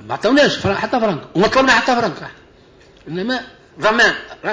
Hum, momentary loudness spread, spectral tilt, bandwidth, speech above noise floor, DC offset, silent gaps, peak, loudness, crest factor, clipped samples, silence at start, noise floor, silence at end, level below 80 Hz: none; 12 LU; -4 dB/octave; 8 kHz; 31 dB; under 0.1%; none; -4 dBFS; -16 LUFS; 14 dB; under 0.1%; 0 s; -47 dBFS; 0 s; -48 dBFS